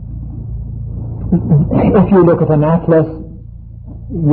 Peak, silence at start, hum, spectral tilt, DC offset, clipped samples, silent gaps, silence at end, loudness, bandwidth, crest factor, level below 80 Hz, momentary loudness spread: 0 dBFS; 0 s; none; -15 dB/octave; under 0.1%; under 0.1%; none; 0 s; -12 LUFS; 3.5 kHz; 12 dB; -28 dBFS; 22 LU